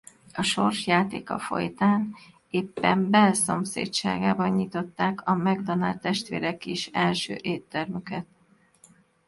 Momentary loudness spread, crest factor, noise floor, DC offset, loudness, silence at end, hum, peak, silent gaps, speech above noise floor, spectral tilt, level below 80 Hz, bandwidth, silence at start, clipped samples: 10 LU; 20 dB; -62 dBFS; under 0.1%; -26 LUFS; 1.05 s; none; -6 dBFS; none; 36 dB; -4.5 dB/octave; -62 dBFS; 11.5 kHz; 0.35 s; under 0.1%